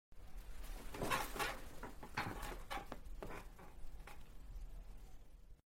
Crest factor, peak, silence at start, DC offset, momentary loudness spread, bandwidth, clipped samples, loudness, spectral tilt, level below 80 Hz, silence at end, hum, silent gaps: 22 dB; -24 dBFS; 0.1 s; under 0.1%; 19 LU; 16.5 kHz; under 0.1%; -47 LUFS; -3.5 dB/octave; -52 dBFS; 0.05 s; none; none